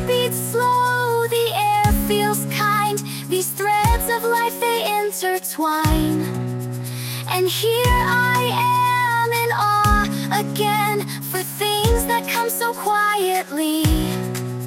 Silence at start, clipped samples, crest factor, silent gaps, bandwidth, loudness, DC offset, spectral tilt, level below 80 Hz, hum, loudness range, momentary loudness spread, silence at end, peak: 0 s; under 0.1%; 16 dB; none; 17 kHz; -19 LUFS; under 0.1%; -4 dB/octave; -32 dBFS; none; 3 LU; 7 LU; 0 s; -4 dBFS